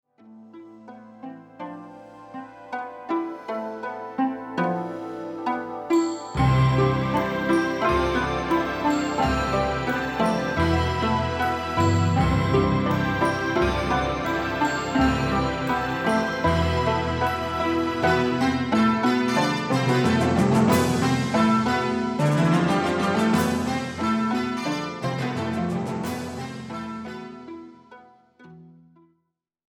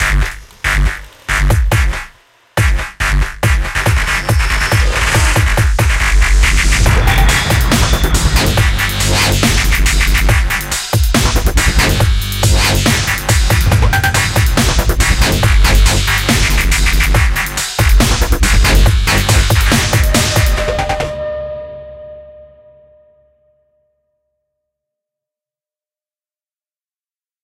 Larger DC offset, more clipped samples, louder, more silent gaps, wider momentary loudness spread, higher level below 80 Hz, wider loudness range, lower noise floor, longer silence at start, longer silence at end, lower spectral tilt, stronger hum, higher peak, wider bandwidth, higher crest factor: neither; neither; second, -23 LUFS vs -12 LUFS; neither; first, 13 LU vs 6 LU; second, -40 dBFS vs -14 dBFS; first, 11 LU vs 4 LU; second, -76 dBFS vs under -90 dBFS; first, 0.25 s vs 0 s; second, 1 s vs 5 s; first, -6 dB/octave vs -3.5 dB/octave; neither; second, -6 dBFS vs 0 dBFS; first, 19 kHz vs 16.5 kHz; first, 18 dB vs 12 dB